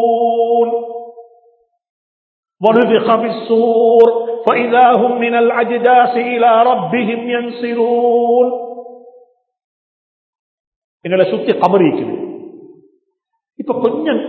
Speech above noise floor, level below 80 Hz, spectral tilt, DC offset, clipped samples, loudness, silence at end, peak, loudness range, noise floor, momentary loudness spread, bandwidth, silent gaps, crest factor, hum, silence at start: 58 dB; -68 dBFS; -8.5 dB/octave; under 0.1%; under 0.1%; -13 LUFS; 0 s; 0 dBFS; 7 LU; -70 dBFS; 13 LU; 4.5 kHz; 1.89-2.43 s, 9.64-10.33 s, 10.39-11.00 s; 14 dB; none; 0 s